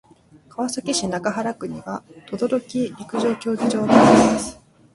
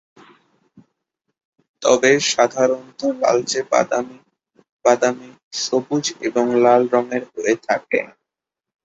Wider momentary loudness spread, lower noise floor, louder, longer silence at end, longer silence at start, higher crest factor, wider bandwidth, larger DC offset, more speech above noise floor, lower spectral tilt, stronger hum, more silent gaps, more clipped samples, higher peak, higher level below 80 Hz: first, 19 LU vs 10 LU; second, -50 dBFS vs -86 dBFS; about the same, -20 LUFS vs -18 LUFS; second, 0.4 s vs 0.8 s; second, 0.6 s vs 1.8 s; about the same, 20 dB vs 18 dB; first, 11.5 kHz vs 8 kHz; neither; second, 31 dB vs 68 dB; first, -5 dB/octave vs -3 dB/octave; neither; second, none vs 4.72-4.79 s, 5.43-5.51 s; neither; about the same, 0 dBFS vs -2 dBFS; first, -52 dBFS vs -64 dBFS